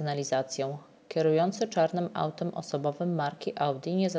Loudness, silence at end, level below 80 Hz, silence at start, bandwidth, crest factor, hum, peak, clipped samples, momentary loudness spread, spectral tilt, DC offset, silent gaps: -30 LUFS; 0 s; -76 dBFS; 0 s; 8 kHz; 16 dB; none; -14 dBFS; under 0.1%; 8 LU; -6 dB/octave; under 0.1%; none